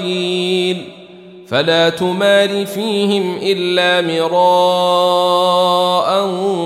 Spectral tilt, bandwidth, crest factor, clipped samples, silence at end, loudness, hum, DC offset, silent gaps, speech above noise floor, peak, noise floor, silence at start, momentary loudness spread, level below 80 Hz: -4.5 dB/octave; 15 kHz; 12 dB; under 0.1%; 0 s; -14 LUFS; none; under 0.1%; none; 23 dB; -2 dBFS; -37 dBFS; 0 s; 5 LU; -66 dBFS